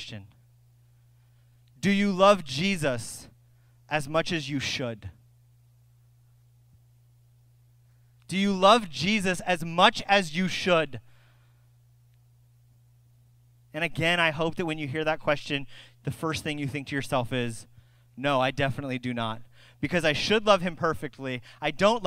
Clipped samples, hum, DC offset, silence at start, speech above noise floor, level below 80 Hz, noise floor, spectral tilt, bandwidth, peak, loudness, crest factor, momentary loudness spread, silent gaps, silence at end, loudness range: under 0.1%; none; under 0.1%; 0 s; 33 dB; -56 dBFS; -59 dBFS; -4.5 dB/octave; 16 kHz; -4 dBFS; -26 LUFS; 24 dB; 15 LU; none; 0 s; 9 LU